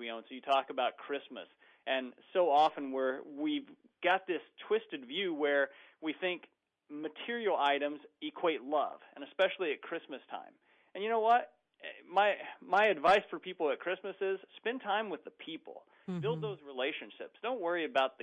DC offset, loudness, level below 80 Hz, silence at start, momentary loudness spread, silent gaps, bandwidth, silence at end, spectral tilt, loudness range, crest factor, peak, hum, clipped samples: under 0.1%; -34 LUFS; -82 dBFS; 0 s; 17 LU; none; 9.8 kHz; 0.1 s; -5.5 dB/octave; 6 LU; 18 dB; -16 dBFS; none; under 0.1%